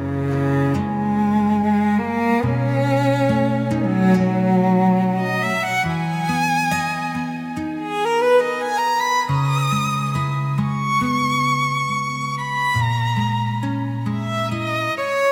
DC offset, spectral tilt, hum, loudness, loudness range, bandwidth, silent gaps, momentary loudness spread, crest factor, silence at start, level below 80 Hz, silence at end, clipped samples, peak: under 0.1%; -6 dB/octave; none; -20 LUFS; 3 LU; 17 kHz; none; 7 LU; 14 dB; 0 s; -54 dBFS; 0 s; under 0.1%; -6 dBFS